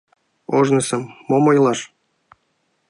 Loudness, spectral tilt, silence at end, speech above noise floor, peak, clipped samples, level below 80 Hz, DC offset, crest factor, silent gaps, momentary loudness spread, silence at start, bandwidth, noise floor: -18 LUFS; -5.5 dB/octave; 1.05 s; 51 dB; -2 dBFS; under 0.1%; -66 dBFS; under 0.1%; 16 dB; none; 16 LU; 0.5 s; 11.5 kHz; -68 dBFS